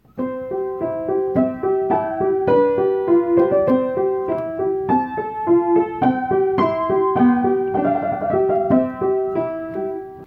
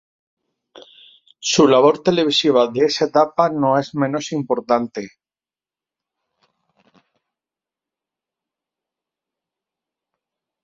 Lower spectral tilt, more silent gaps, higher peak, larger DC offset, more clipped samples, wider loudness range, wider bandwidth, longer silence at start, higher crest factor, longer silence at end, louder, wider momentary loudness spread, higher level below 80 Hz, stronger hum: first, -10 dB/octave vs -4.5 dB/octave; neither; second, -4 dBFS vs 0 dBFS; neither; neither; second, 1 LU vs 11 LU; second, 4.5 kHz vs 7.8 kHz; second, 0.15 s vs 1.4 s; second, 14 dB vs 22 dB; second, 0 s vs 5.55 s; about the same, -19 LUFS vs -17 LUFS; about the same, 9 LU vs 11 LU; first, -52 dBFS vs -64 dBFS; neither